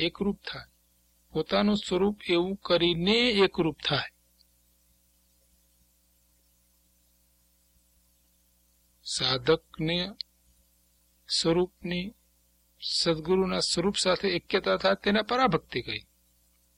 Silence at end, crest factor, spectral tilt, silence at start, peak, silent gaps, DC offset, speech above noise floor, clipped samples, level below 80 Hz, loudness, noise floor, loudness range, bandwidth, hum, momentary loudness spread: 0.75 s; 20 dB; -4.5 dB/octave; 0 s; -10 dBFS; none; under 0.1%; 40 dB; under 0.1%; -56 dBFS; -27 LUFS; -67 dBFS; 7 LU; 16 kHz; 60 Hz at -60 dBFS; 13 LU